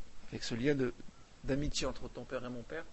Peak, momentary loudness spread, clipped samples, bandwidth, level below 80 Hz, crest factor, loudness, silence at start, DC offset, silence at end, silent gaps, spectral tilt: -20 dBFS; 15 LU; under 0.1%; 8.2 kHz; -50 dBFS; 18 dB; -38 LUFS; 0 s; under 0.1%; 0 s; none; -5 dB/octave